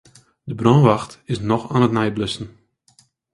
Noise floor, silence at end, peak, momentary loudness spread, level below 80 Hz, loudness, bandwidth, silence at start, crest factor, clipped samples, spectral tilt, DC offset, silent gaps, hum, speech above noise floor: -58 dBFS; 0.85 s; 0 dBFS; 18 LU; -50 dBFS; -19 LUFS; 11.5 kHz; 0.45 s; 20 dB; under 0.1%; -7 dB/octave; under 0.1%; none; none; 40 dB